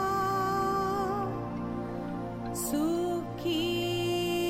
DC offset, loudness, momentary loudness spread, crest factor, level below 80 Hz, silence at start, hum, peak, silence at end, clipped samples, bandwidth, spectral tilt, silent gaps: under 0.1%; -31 LUFS; 7 LU; 10 dB; -52 dBFS; 0 s; none; -20 dBFS; 0 s; under 0.1%; 16 kHz; -5 dB/octave; none